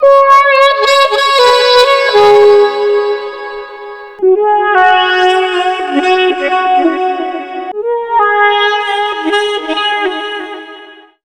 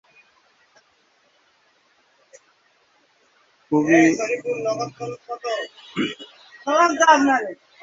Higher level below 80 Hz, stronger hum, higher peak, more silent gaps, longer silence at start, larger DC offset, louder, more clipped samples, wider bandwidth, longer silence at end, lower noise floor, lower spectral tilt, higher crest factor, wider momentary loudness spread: first, -52 dBFS vs -68 dBFS; neither; about the same, 0 dBFS vs -2 dBFS; neither; second, 0 s vs 3.7 s; first, 0.2% vs under 0.1%; first, -9 LUFS vs -20 LUFS; first, 1% vs under 0.1%; first, 13 kHz vs 7.8 kHz; about the same, 0.35 s vs 0.3 s; second, -35 dBFS vs -62 dBFS; second, -2 dB/octave vs -4 dB/octave; second, 10 dB vs 20 dB; about the same, 16 LU vs 18 LU